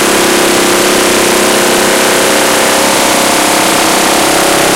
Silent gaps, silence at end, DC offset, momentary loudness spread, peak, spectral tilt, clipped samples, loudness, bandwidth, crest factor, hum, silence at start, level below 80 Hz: none; 0 s; 0.5%; 0 LU; 0 dBFS; -2 dB/octave; under 0.1%; -7 LUFS; 17 kHz; 8 dB; none; 0 s; -38 dBFS